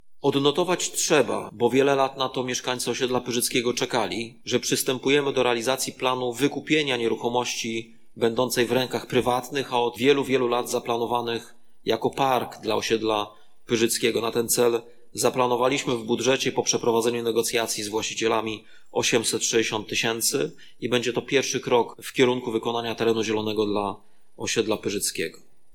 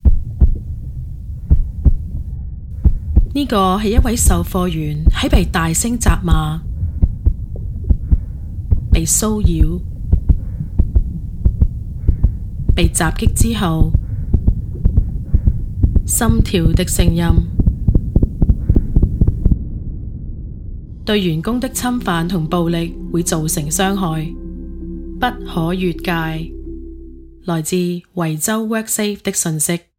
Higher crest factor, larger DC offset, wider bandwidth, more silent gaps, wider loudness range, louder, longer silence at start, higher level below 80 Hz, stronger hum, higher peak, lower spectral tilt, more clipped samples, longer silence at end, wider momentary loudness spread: first, 20 dB vs 14 dB; neither; about the same, 18 kHz vs 16.5 kHz; neither; second, 2 LU vs 5 LU; second, -24 LUFS vs -18 LUFS; about the same, 0.05 s vs 0.05 s; second, -60 dBFS vs -18 dBFS; neither; second, -6 dBFS vs -2 dBFS; second, -3 dB/octave vs -5 dB/octave; neither; second, 0 s vs 0.2 s; second, 6 LU vs 13 LU